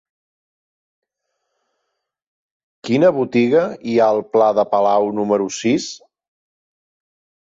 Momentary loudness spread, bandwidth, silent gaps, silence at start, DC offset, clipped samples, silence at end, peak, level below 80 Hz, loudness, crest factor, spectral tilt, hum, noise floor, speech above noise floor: 6 LU; 7.8 kHz; none; 2.85 s; under 0.1%; under 0.1%; 1.45 s; -4 dBFS; -64 dBFS; -17 LUFS; 16 dB; -5.5 dB/octave; none; -76 dBFS; 60 dB